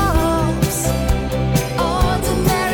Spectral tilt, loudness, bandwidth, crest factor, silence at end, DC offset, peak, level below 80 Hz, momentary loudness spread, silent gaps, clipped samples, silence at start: -5 dB/octave; -18 LUFS; 19 kHz; 14 dB; 0 s; under 0.1%; -4 dBFS; -24 dBFS; 3 LU; none; under 0.1%; 0 s